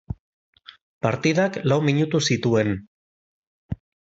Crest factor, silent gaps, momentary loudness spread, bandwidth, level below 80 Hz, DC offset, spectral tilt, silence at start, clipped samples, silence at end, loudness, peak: 20 dB; 0.19-0.53 s, 0.81-1.01 s, 2.87-3.69 s; 16 LU; 8 kHz; -50 dBFS; under 0.1%; -5.5 dB/octave; 0.1 s; under 0.1%; 0.4 s; -22 LUFS; -6 dBFS